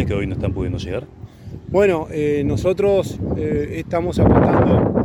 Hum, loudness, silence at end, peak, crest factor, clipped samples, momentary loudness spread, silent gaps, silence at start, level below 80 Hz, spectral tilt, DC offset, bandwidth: none; -19 LUFS; 0 s; 0 dBFS; 18 dB; under 0.1%; 14 LU; none; 0 s; -32 dBFS; -8 dB/octave; under 0.1%; 13 kHz